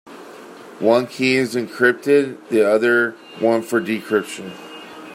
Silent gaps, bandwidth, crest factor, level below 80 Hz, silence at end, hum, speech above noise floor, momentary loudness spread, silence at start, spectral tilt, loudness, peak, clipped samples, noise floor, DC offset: none; 16 kHz; 16 dB; -70 dBFS; 0 s; none; 21 dB; 21 LU; 0.05 s; -5 dB/octave; -18 LUFS; -2 dBFS; under 0.1%; -39 dBFS; under 0.1%